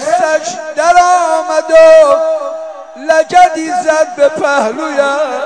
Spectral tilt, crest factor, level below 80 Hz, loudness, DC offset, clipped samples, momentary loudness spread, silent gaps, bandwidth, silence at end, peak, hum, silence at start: -2 dB/octave; 10 dB; -50 dBFS; -10 LUFS; under 0.1%; 1%; 13 LU; none; 10.5 kHz; 0 s; 0 dBFS; none; 0 s